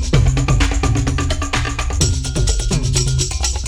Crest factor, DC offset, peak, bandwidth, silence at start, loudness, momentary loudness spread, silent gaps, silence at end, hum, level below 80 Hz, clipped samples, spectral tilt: 14 dB; 0.3%; -2 dBFS; 14 kHz; 0 s; -18 LUFS; 4 LU; none; 0 s; none; -20 dBFS; under 0.1%; -4 dB/octave